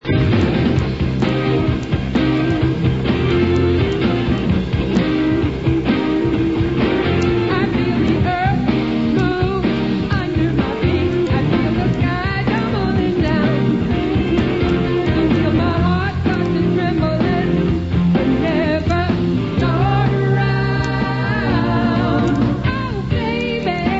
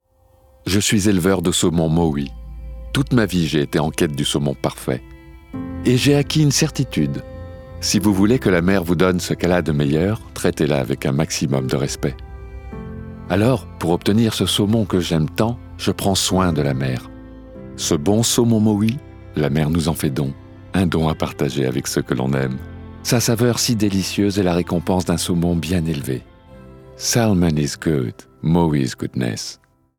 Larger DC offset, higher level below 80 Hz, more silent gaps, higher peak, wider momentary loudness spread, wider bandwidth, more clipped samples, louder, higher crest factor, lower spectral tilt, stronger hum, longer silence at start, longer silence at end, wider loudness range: first, 0.5% vs under 0.1%; first, -30 dBFS vs -40 dBFS; neither; second, -4 dBFS vs 0 dBFS; second, 3 LU vs 14 LU; second, 7.8 kHz vs 19.5 kHz; neither; about the same, -17 LUFS vs -19 LUFS; about the same, 14 dB vs 18 dB; first, -8 dB/octave vs -5 dB/octave; neither; second, 0 s vs 0.65 s; second, 0 s vs 0.45 s; about the same, 1 LU vs 3 LU